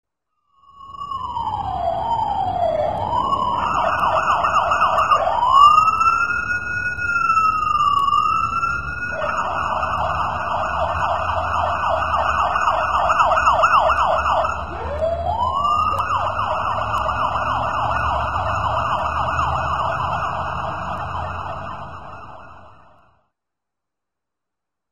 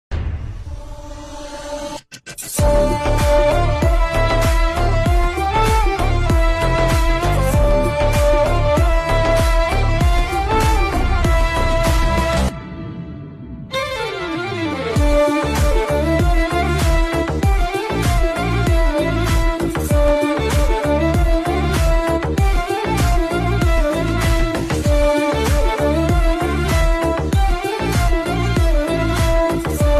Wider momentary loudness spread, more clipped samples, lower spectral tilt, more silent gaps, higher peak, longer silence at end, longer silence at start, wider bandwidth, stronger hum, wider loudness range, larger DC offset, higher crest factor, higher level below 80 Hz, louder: about the same, 11 LU vs 10 LU; neither; second, -4.5 dB/octave vs -6 dB/octave; neither; first, 0 dBFS vs -6 dBFS; about the same, 0 s vs 0 s; about the same, 0.05 s vs 0.1 s; second, 11.5 kHz vs 14 kHz; neither; first, 9 LU vs 3 LU; first, 1% vs under 0.1%; first, 20 dB vs 10 dB; second, -38 dBFS vs -20 dBFS; about the same, -19 LUFS vs -18 LUFS